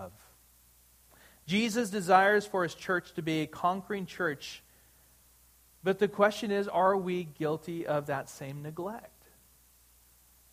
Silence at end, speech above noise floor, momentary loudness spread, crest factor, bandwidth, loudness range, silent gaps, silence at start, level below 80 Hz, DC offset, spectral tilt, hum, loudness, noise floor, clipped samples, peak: 1.45 s; 32 dB; 15 LU; 22 dB; 15.5 kHz; 6 LU; none; 0 s; -68 dBFS; under 0.1%; -5 dB/octave; none; -30 LUFS; -62 dBFS; under 0.1%; -10 dBFS